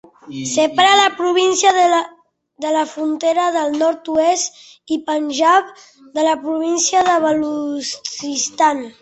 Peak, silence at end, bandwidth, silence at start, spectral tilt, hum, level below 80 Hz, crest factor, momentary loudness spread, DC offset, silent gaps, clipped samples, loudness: -2 dBFS; 0.1 s; 8.4 kHz; 0.25 s; -1.5 dB/octave; none; -62 dBFS; 16 dB; 11 LU; under 0.1%; none; under 0.1%; -16 LUFS